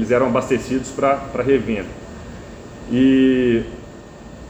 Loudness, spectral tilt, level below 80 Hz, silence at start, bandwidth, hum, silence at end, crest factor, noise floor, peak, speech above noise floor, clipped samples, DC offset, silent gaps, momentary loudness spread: -18 LUFS; -6.5 dB/octave; -42 dBFS; 0 s; 8.6 kHz; none; 0 s; 16 dB; -38 dBFS; -4 dBFS; 20 dB; under 0.1%; under 0.1%; none; 22 LU